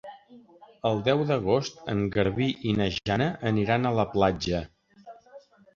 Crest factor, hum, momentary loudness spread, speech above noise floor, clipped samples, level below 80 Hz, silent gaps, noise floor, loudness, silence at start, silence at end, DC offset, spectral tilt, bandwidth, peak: 20 dB; none; 6 LU; 26 dB; under 0.1%; -50 dBFS; none; -52 dBFS; -26 LUFS; 0.05 s; 0.35 s; under 0.1%; -6.5 dB/octave; 7.4 kHz; -8 dBFS